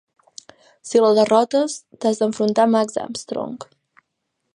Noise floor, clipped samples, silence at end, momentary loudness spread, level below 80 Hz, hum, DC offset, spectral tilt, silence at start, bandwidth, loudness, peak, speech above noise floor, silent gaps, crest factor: -76 dBFS; under 0.1%; 0.95 s; 13 LU; -70 dBFS; none; under 0.1%; -4.5 dB/octave; 0.85 s; 11.5 kHz; -19 LUFS; -2 dBFS; 57 dB; none; 18 dB